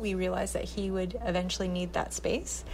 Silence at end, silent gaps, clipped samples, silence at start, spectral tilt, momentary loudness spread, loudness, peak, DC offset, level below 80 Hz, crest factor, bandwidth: 0 s; none; under 0.1%; 0 s; -4.5 dB/octave; 2 LU; -32 LUFS; -18 dBFS; under 0.1%; -42 dBFS; 14 dB; 15.5 kHz